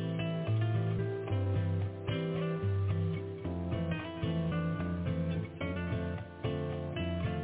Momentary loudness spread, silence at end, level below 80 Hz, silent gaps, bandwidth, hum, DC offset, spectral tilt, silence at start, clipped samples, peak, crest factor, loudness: 5 LU; 0 s; -46 dBFS; none; 4 kHz; none; under 0.1%; -7 dB/octave; 0 s; under 0.1%; -22 dBFS; 12 dB; -35 LUFS